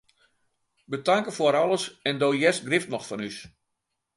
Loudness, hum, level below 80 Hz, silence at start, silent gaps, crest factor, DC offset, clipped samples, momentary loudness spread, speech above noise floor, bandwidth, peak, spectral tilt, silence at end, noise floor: -25 LUFS; none; -70 dBFS; 0.9 s; none; 20 dB; under 0.1%; under 0.1%; 13 LU; 56 dB; 11.5 kHz; -6 dBFS; -4 dB/octave; 0.7 s; -81 dBFS